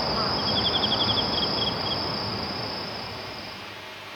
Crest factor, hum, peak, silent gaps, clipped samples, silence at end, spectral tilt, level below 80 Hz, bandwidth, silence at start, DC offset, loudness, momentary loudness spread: 16 dB; none; -10 dBFS; none; under 0.1%; 0 s; -4.5 dB/octave; -48 dBFS; over 20 kHz; 0 s; under 0.1%; -25 LUFS; 14 LU